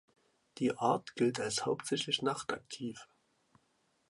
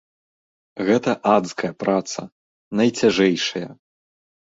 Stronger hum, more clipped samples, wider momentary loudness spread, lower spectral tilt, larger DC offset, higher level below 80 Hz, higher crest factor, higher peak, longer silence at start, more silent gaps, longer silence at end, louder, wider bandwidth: neither; neither; second, 11 LU vs 14 LU; about the same, -4 dB/octave vs -4.5 dB/octave; neither; second, -76 dBFS vs -60 dBFS; about the same, 20 dB vs 20 dB; second, -16 dBFS vs -2 dBFS; second, 0.55 s vs 0.75 s; second, none vs 2.32-2.71 s; first, 1.05 s vs 0.65 s; second, -35 LUFS vs -20 LUFS; first, 11.5 kHz vs 8 kHz